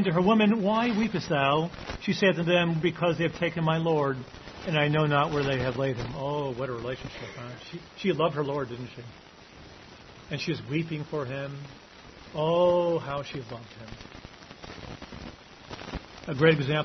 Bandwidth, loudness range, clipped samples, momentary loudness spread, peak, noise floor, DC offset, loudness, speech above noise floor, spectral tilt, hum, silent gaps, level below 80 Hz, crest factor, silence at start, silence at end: 6.4 kHz; 9 LU; under 0.1%; 22 LU; -8 dBFS; -49 dBFS; under 0.1%; -27 LUFS; 22 dB; -6.5 dB/octave; none; none; -54 dBFS; 20 dB; 0 s; 0 s